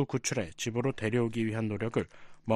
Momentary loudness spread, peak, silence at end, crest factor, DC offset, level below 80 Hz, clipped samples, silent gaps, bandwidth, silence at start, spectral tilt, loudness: 5 LU; -12 dBFS; 0 s; 20 dB; under 0.1%; -60 dBFS; under 0.1%; none; 13 kHz; 0 s; -5.5 dB/octave; -32 LUFS